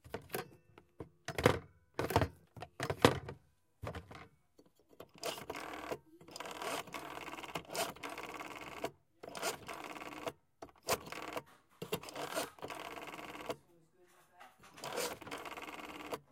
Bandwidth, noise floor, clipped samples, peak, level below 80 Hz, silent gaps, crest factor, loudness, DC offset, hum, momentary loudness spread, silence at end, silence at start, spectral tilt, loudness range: 17 kHz; -69 dBFS; under 0.1%; -8 dBFS; -62 dBFS; none; 34 dB; -41 LUFS; under 0.1%; none; 21 LU; 0.1 s; 0.05 s; -4 dB/octave; 9 LU